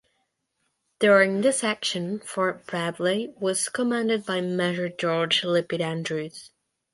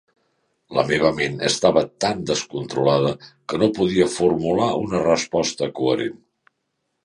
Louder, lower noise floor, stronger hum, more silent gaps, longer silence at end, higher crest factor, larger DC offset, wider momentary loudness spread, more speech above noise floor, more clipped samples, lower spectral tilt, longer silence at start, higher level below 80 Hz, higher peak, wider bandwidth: second, -24 LUFS vs -21 LUFS; about the same, -76 dBFS vs -75 dBFS; neither; neither; second, 0.45 s vs 0.9 s; about the same, 20 dB vs 20 dB; neither; first, 10 LU vs 6 LU; second, 51 dB vs 55 dB; neither; about the same, -4 dB/octave vs -4.5 dB/octave; first, 1 s vs 0.7 s; second, -72 dBFS vs -52 dBFS; second, -6 dBFS vs -2 dBFS; about the same, 11.5 kHz vs 11.5 kHz